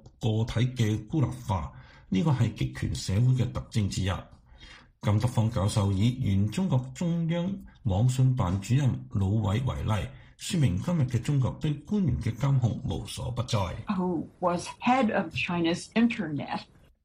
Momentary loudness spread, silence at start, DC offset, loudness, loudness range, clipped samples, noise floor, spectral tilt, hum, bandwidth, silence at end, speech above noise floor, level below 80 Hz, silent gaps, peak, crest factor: 7 LU; 0.2 s; under 0.1%; -28 LUFS; 2 LU; under 0.1%; -51 dBFS; -6.5 dB/octave; none; 15 kHz; 0.4 s; 24 dB; -48 dBFS; none; -12 dBFS; 16 dB